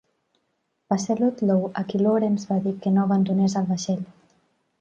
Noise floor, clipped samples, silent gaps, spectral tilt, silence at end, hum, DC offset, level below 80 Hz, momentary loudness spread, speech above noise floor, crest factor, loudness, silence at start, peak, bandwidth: -74 dBFS; under 0.1%; none; -7 dB/octave; 0.7 s; none; under 0.1%; -66 dBFS; 7 LU; 52 dB; 16 dB; -23 LUFS; 0.9 s; -8 dBFS; 7.8 kHz